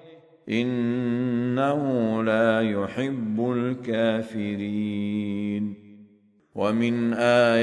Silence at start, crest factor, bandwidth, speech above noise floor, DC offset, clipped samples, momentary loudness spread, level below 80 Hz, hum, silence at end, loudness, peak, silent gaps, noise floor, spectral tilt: 0.05 s; 18 dB; 10.5 kHz; 35 dB; under 0.1%; under 0.1%; 8 LU; -66 dBFS; none; 0 s; -25 LUFS; -8 dBFS; none; -59 dBFS; -7 dB/octave